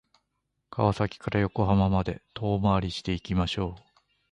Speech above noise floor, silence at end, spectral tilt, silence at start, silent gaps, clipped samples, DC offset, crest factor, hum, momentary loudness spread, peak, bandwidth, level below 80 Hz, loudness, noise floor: 53 dB; 0.5 s; -7.5 dB/octave; 0.7 s; none; under 0.1%; under 0.1%; 20 dB; none; 9 LU; -8 dBFS; 9.6 kHz; -42 dBFS; -27 LUFS; -79 dBFS